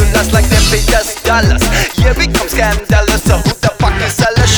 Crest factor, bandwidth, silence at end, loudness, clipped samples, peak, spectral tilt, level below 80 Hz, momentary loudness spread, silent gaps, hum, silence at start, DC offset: 10 dB; over 20 kHz; 0 s; -11 LUFS; under 0.1%; 0 dBFS; -4 dB/octave; -14 dBFS; 3 LU; none; none; 0 s; under 0.1%